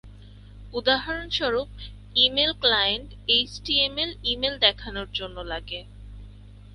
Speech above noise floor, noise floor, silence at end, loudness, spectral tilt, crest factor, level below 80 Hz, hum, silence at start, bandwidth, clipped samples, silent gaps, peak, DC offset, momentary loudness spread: 20 dB; -45 dBFS; 0 s; -23 LUFS; -4 dB/octave; 24 dB; -44 dBFS; 50 Hz at -45 dBFS; 0.05 s; 11.5 kHz; under 0.1%; none; -4 dBFS; under 0.1%; 14 LU